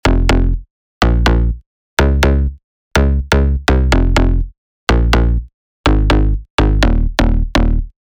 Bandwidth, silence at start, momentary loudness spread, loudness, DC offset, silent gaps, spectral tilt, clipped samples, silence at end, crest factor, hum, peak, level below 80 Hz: 14.5 kHz; 0.05 s; 8 LU; -15 LUFS; under 0.1%; 0.70-1.01 s, 1.66-1.97 s, 2.64-2.91 s, 4.58-4.87 s, 5.54-5.84 s, 6.50-6.58 s; -6 dB/octave; under 0.1%; 0.15 s; 12 dB; none; 0 dBFS; -14 dBFS